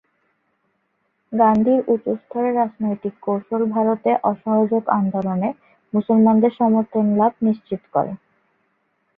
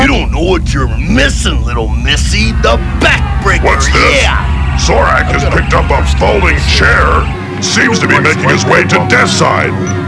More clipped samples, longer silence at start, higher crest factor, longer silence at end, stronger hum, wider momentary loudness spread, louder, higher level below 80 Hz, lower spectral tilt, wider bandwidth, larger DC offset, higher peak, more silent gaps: second, under 0.1% vs 0.5%; first, 1.3 s vs 0 s; first, 18 dB vs 8 dB; first, 1 s vs 0 s; neither; first, 10 LU vs 6 LU; second, -19 LUFS vs -9 LUFS; second, -64 dBFS vs -14 dBFS; first, -11 dB/octave vs -4.5 dB/octave; second, 3.7 kHz vs 11 kHz; second, under 0.1% vs 0.4%; about the same, -2 dBFS vs 0 dBFS; neither